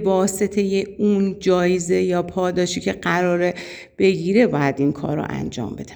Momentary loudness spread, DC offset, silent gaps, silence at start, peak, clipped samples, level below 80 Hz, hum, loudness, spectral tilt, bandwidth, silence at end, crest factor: 8 LU; under 0.1%; none; 0 s; -4 dBFS; under 0.1%; -50 dBFS; none; -20 LUFS; -5.5 dB/octave; over 20 kHz; 0 s; 16 dB